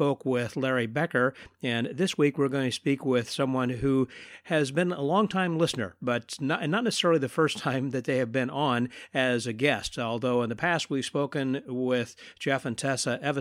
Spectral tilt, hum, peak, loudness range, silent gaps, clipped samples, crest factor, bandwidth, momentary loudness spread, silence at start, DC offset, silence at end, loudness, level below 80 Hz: -5 dB/octave; none; -8 dBFS; 2 LU; none; under 0.1%; 20 dB; 15.5 kHz; 5 LU; 0 s; under 0.1%; 0 s; -28 LUFS; -62 dBFS